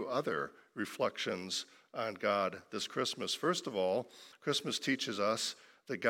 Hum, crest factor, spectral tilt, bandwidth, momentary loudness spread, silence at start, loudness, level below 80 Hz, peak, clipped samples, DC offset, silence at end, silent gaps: none; 22 dB; -3 dB/octave; 16.5 kHz; 9 LU; 0 s; -36 LUFS; -84 dBFS; -16 dBFS; under 0.1%; under 0.1%; 0 s; none